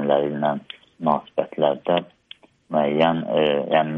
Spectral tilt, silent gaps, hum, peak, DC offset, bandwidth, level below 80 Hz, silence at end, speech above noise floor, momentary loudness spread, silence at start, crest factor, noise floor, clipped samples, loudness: -8.5 dB/octave; none; none; -4 dBFS; under 0.1%; 5.6 kHz; -66 dBFS; 0 s; 28 dB; 8 LU; 0 s; 18 dB; -49 dBFS; under 0.1%; -22 LUFS